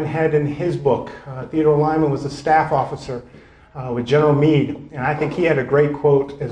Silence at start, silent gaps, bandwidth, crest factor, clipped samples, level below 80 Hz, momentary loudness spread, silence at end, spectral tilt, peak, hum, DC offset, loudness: 0 s; none; 9.6 kHz; 14 dB; under 0.1%; -48 dBFS; 14 LU; 0 s; -8 dB/octave; -4 dBFS; none; under 0.1%; -18 LUFS